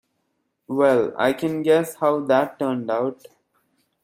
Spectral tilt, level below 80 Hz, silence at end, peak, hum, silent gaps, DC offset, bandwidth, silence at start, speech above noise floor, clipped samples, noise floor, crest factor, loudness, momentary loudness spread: -6 dB/octave; -68 dBFS; 0.9 s; -4 dBFS; none; none; under 0.1%; 16 kHz; 0.7 s; 53 dB; under 0.1%; -73 dBFS; 18 dB; -21 LUFS; 7 LU